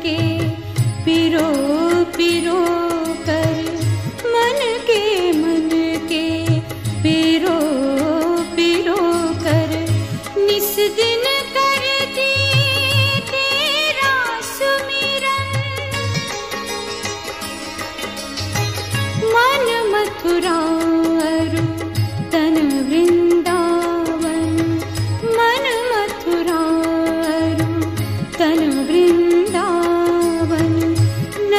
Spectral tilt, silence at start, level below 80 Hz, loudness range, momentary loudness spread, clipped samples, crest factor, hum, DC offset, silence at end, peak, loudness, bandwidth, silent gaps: -5 dB/octave; 0 s; -46 dBFS; 4 LU; 7 LU; under 0.1%; 14 dB; none; 0.2%; 0 s; -2 dBFS; -17 LUFS; 15.5 kHz; none